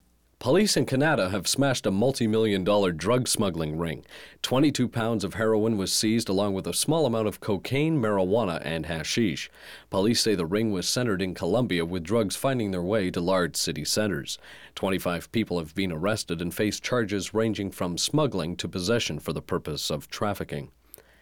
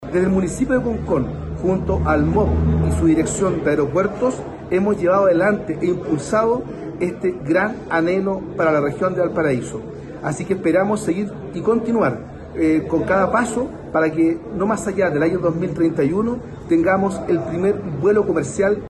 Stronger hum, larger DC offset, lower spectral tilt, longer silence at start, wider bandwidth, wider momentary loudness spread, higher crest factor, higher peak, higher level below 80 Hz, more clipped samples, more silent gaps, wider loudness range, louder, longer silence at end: neither; first, 0.2% vs under 0.1%; second, -4.5 dB/octave vs -7 dB/octave; first, 0.4 s vs 0 s; first, 19.5 kHz vs 12 kHz; about the same, 8 LU vs 7 LU; about the same, 12 dB vs 12 dB; second, -14 dBFS vs -6 dBFS; second, -56 dBFS vs -36 dBFS; neither; neither; about the same, 4 LU vs 2 LU; second, -26 LUFS vs -19 LUFS; first, 0.55 s vs 0 s